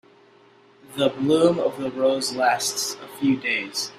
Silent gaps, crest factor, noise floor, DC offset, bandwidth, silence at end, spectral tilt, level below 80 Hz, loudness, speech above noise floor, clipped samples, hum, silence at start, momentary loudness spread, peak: none; 18 dB; -54 dBFS; under 0.1%; 16 kHz; 0 s; -3.5 dB/octave; -66 dBFS; -22 LUFS; 31 dB; under 0.1%; none; 0.9 s; 7 LU; -4 dBFS